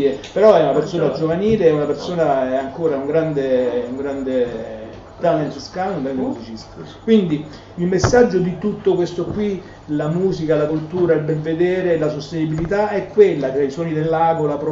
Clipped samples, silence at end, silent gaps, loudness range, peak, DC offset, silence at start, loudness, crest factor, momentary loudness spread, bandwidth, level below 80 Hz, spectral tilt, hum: under 0.1%; 0 s; none; 4 LU; 0 dBFS; under 0.1%; 0 s; -18 LUFS; 18 dB; 11 LU; 7.6 kHz; -44 dBFS; -7 dB/octave; none